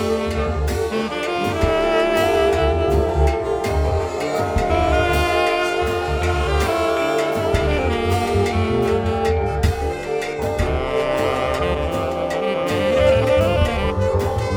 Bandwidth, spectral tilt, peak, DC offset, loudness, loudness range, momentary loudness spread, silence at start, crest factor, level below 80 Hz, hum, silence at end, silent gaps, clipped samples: 19 kHz; -6 dB/octave; -4 dBFS; under 0.1%; -19 LUFS; 2 LU; 5 LU; 0 s; 16 dB; -28 dBFS; none; 0 s; none; under 0.1%